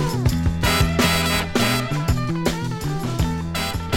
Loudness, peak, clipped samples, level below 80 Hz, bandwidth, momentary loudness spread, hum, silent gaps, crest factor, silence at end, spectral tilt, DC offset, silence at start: -21 LUFS; -2 dBFS; under 0.1%; -30 dBFS; 17 kHz; 7 LU; none; none; 18 dB; 0 s; -4.5 dB/octave; under 0.1%; 0 s